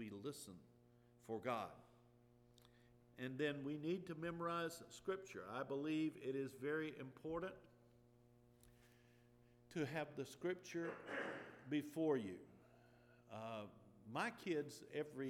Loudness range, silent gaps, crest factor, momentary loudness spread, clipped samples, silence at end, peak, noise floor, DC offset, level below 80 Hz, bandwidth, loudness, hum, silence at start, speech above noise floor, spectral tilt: 6 LU; none; 20 dB; 12 LU; under 0.1%; 0 s; -28 dBFS; -71 dBFS; under 0.1%; -80 dBFS; 16.5 kHz; -47 LUFS; none; 0 s; 25 dB; -5.5 dB/octave